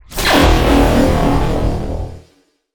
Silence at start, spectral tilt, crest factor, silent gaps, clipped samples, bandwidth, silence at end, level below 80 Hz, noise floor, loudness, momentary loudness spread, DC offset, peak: 0.1 s; -5.5 dB/octave; 14 dB; none; under 0.1%; over 20 kHz; 0.55 s; -20 dBFS; -55 dBFS; -14 LUFS; 14 LU; under 0.1%; 0 dBFS